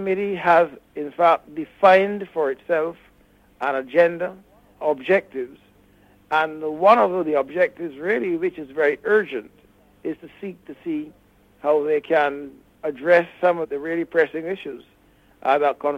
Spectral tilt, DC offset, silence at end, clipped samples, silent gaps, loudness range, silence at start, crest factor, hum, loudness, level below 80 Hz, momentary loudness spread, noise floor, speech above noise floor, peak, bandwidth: -6.5 dB/octave; under 0.1%; 0 s; under 0.1%; none; 5 LU; 0 s; 18 dB; none; -21 LUFS; -64 dBFS; 16 LU; -56 dBFS; 35 dB; -4 dBFS; 8.6 kHz